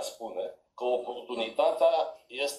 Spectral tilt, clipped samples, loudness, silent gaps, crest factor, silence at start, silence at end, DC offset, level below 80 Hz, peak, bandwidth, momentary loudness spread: -2 dB/octave; under 0.1%; -30 LUFS; none; 18 dB; 0 s; 0 s; under 0.1%; -78 dBFS; -12 dBFS; 14.5 kHz; 12 LU